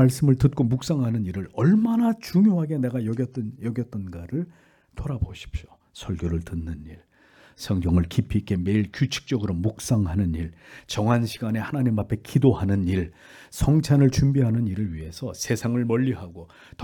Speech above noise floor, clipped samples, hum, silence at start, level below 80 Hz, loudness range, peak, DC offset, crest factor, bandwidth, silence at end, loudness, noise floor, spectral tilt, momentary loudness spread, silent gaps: 32 dB; under 0.1%; none; 0 s; -44 dBFS; 9 LU; -6 dBFS; under 0.1%; 18 dB; 18 kHz; 0 s; -24 LUFS; -55 dBFS; -7 dB/octave; 15 LU; none